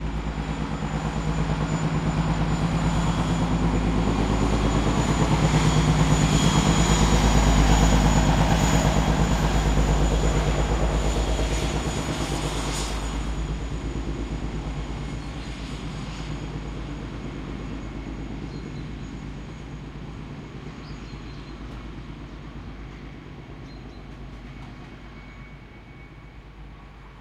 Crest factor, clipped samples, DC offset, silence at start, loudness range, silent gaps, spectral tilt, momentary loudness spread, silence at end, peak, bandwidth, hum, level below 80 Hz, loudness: 20 dB; under 0.1%; under 0.1%; 0 s; 20 LU; none; -5.5 dB/octave; 21 LU; 0 s; -6 dBFS; 14.5 kHz; none; -28 dBFS; -24 LUFS